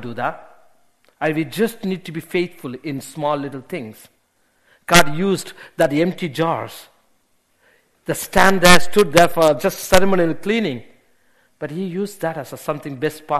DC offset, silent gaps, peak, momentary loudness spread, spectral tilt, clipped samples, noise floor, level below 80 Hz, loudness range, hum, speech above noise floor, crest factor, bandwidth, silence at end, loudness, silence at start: under 0.1%; none; 0 dBFS; 17 LU; -4 dB/octave; under 0.1%; -64 dBFS; -42 dBFS; 9 LU; none; 46 dB; 18 dB; 13.5 kHz; 0 s; -18 LUFS; 0 s